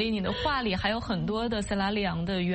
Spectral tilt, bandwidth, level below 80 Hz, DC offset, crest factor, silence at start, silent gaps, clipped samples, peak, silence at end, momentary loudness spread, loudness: -6 dB/octave; 8.4 kHz; -44 dBFS; under 0.1%; 16 dB; 0 s; none; under 0.1%; -12 dBFS; 0 s; 2 LU; -29 LUFS